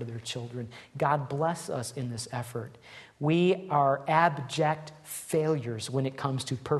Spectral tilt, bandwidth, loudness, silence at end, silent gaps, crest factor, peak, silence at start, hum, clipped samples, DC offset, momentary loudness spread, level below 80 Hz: -5.5 dB/octave; 12.5 kHz; -29 LUFS; 0 s; none; 20 dB; -10 dBFS; 0 s; none; under 0.1%; under 0.1%; 15 LU; -66 dBFS